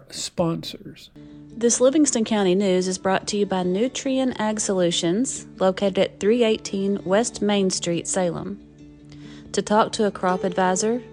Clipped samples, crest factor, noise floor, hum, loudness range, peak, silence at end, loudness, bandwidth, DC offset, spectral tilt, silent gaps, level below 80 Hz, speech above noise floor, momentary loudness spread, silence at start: under 0.1%; 18 dB; -45 dBFS; none; 3 LU; -4 dBFS; 0 s; -22 LUFS; 12.5 kHz; under 0.1%; -4 dB/octave; none; -56 dBFS; 23 dB; 10 LU; 0.1 s